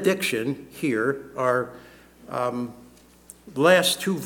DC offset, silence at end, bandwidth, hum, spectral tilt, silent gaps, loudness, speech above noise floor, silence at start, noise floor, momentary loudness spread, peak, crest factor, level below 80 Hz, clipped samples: under 0.1%; 0 s; 19 kHz; none; -4 dB/octave; none; -24 LUFS; 27 dB; 0 s; -50 dBFS; 16 LU; -4 dBFS; 20 dB; -62 dBFS; under 0.1%